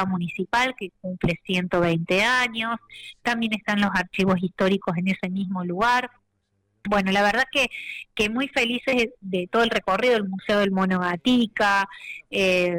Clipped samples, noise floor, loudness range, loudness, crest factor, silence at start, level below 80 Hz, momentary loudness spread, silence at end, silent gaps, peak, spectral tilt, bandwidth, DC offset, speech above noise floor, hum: under 0.1%; -72 dBFS; 2 LU; -23 LUFS; 10 dB; 0 s; -52 dBFS; 9 LU; 0 s; none; -14 dBFS; -5 dB/octave; 16 kHz; under 0.1%; 48 dB; none